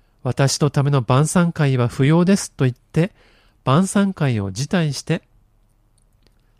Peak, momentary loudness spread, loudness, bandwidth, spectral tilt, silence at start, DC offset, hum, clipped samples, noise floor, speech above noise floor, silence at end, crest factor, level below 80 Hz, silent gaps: -4 dBFS; 8 LU; -19 LUFS; 14 kHz; -6 dB/octave; 0.25 s; under 0.1%; none; under 0.1%; -58 dBFS; 40 dB; 1.4 s; 16 dB; -50 dBFS; none